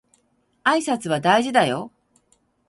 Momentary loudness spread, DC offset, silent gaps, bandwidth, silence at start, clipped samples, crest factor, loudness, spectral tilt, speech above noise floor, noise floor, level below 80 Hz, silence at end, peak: 10 LU; under 0.1%; none; 11.5 kHz; 0.65 s; under 0.1%; 20 dB; -20 LUFS; -4.5 dB/octave; 46 dB; -66 dBFS; -66 dBFS; 0.8 s; -2 dBFS